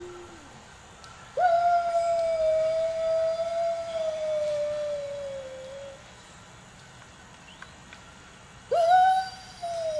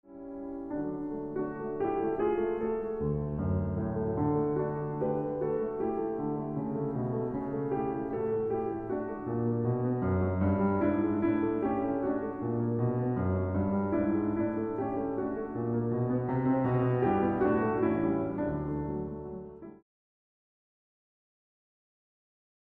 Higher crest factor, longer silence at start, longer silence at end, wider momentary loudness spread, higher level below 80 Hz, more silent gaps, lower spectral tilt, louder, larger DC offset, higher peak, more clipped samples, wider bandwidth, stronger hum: about the same, 16 dB vs 16 dB; about the same, 0 s vs 0.1 s; second, 0 s vs 2.9 s; first, 25 LU vs 8 LU; second, -60 dBFS vs -52 dBFS; neither; second, -3.5 dB/octave vs -12 dB/octave; first, -26 LUFS vs -31 LUFS; neither; first, -12 dBFS vs -16 dBFS; neither; first, 11 kHz vs 3.6 kHz; neither